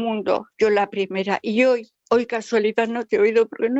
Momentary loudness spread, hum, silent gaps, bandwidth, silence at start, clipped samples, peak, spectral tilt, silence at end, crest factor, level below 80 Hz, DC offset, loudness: 5 LU; none; none; 8 kHz; 0 s; under 0.1%; -6 dBFS; -5.5 dB/octave; 0 s; 16 dB; -64 dBFS; under 0.1%; -21 LUFS